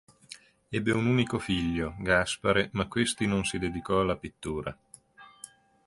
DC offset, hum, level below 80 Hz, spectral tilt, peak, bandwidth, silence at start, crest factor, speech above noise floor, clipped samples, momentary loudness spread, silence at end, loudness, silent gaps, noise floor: under 0.1%; none; -50 dBFS; -5 dB/octave; -10 dBFS; 11.5 kHz; 0.3 s; 20 dB; 26 dB; under 0.1%; 22 LU; 0.4 s; -28 LUFS; none; -54 dBFS